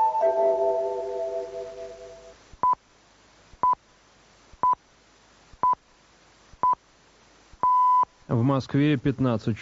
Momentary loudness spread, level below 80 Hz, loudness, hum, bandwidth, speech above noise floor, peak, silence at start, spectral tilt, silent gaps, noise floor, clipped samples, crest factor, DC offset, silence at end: 13 LU; -58 dBFS; -25 LUFS; none; 7.6 kHz; 35 dB; -10 dBFS; 0 s; -7 dB/octave; none; -58 dBFS; under 0.1%; 16 dB; under 0.1%; 0 s